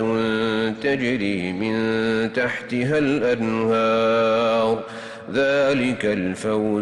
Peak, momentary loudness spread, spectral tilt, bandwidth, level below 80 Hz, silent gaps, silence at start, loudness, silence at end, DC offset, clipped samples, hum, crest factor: -10 dBFS; 6 LU; -6 dB/octave; 11.5 kHz; -56 dBFS; none; 0 s; -21 LUFS; 0 s; under 0.1%; under 0.1%; none; 10 dB